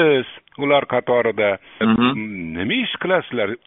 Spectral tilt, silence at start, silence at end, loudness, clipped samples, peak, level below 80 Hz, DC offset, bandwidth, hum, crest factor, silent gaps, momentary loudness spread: -3.5 dB/octave; 0 s; 0.1 s; -19 LUFS; under 0.1%; -2 dBFS; -54 dBFS; under 0.1%; 4 kHz; none; 16 dB; none; 9 LU